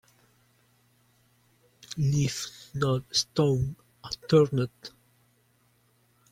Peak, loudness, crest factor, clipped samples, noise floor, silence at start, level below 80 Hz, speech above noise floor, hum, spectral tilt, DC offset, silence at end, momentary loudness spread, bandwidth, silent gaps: -10 dBFS; -27 LUFS; 20 dB; under 0.1%; -67 dBFS; 1.9 s; -56 dBFS; 40 dB; none; -5.5 dB/octave; under 0.1%; 1.45 s; 17 LU; 15.5 kHz; none